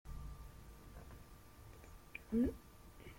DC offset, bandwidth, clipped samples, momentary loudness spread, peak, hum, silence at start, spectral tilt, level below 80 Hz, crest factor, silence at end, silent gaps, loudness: under 0.1%; 16.5 kHz; under 0.1%; 21 LU; -26 dBFS; none; 0.05 s; -7 dB/octave; -56 dBFS; 20 dB; 0 s; none; -42 LUFS